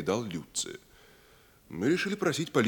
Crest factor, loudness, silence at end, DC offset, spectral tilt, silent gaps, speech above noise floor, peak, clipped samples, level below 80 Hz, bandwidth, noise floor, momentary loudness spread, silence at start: 20 dB; -31 LUFS; 0 s; under 0.1%; -4.5 dB/octave; none; 29 dB; -12 dBFS; under 0.1%; -66 dBFS; 19 kHz; -59 dBFS; 13 LU; 0 s